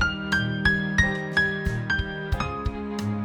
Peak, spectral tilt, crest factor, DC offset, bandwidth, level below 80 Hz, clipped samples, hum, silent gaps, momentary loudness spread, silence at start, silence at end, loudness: -6 dBFS; -5.5 dB/octave; 18 dB; under 0.1%; 18.5 kHz; -36 dBFS; under 0.1%; none; none; 8 LU; 0 s; 0 s; -25 LUFS